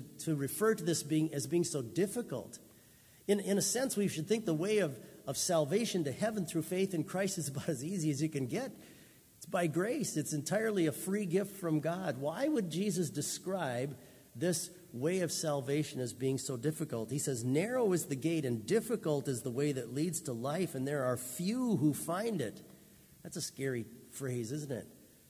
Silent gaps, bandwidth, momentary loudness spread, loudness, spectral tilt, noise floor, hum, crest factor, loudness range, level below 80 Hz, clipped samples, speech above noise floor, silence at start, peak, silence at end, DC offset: none; 16 kHz; 9 LU; -35 LUFS; -5 dB/octave; -61 dBFS; none; 18 dB; 3 LU; -72 dBFS; under 0.1%; 27 dB; 0 s; -18 dBFS; 0.25 s; under 0.1%